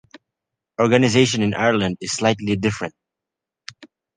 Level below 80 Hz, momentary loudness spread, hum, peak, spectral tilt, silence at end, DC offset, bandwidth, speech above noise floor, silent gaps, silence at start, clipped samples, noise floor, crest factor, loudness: -52 dBFS; 24 LU; none; -2 dBFS; -5 dB/octave; 0.3 s; under 0.1%; 10 kHz; 67 dB; none; 0.8 s; under 0.1%; -86 dBFS; 20 dB; -19 LUFS